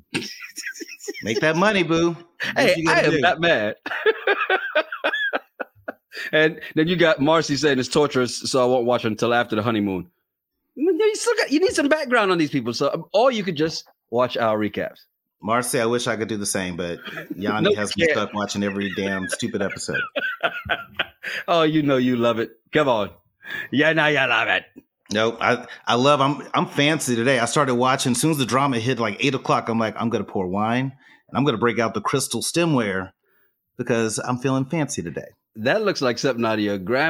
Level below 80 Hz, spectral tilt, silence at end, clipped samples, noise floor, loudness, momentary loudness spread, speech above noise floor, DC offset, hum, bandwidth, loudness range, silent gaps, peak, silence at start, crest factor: -60 dBFS; -4.5 dB/octave; 0 s; under 0.1%; -78 dBFS; -21 LUFS; 11 LU; 57 dB; under 0.1%; none; 16.5 kHz; 4 LU; none; -2 dBFS; 0.15 s; 20 dB